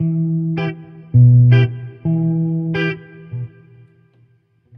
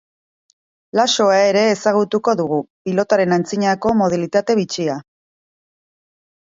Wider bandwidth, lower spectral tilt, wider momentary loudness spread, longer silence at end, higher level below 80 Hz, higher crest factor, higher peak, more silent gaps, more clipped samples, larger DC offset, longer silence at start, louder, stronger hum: second, 5 kHz vs 7.8 kHz; first, -10.5 dB/octave vs -4.5 dB/octave; first, 20 LU vs 9 LU; second, 1.3 s vs 1.5 s; first, -48 dBFS vs -58 dBFS; about the same, 14 dB vs 16 dB; about the same, -2 dBFS vs -2 dBFS; second, none vs 2.70-2.85 s; neither; neither; second, 0 s vs 0.95 s; about the same, -16 LUFS vs -17 LUFS; neither